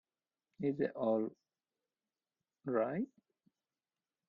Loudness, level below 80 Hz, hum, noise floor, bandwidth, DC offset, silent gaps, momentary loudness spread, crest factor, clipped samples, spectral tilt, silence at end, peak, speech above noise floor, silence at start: -38 LUFS; -84 dBFS; none; under -90 dBFS; 5 kHz; under 0.1%; none; 9 LU; 20 dB; under 0.1%; -10 dB/octave; 1.2 s; -22 dBFS; over 54 dB; 0.6 s